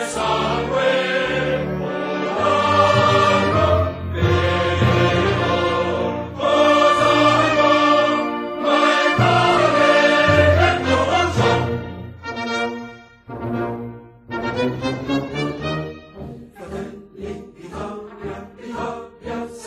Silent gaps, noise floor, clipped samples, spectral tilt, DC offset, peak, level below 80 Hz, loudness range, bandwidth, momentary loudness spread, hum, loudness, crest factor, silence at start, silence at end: none; -38 dBFS; under 0.1%; -5.5 dB/octave; under 0.1%; -2 dBFS; -42 dBFS; 13 LU; 13 kHz; 19 LU; none; -17 LUFS; 18 dB; 0 s; 0 s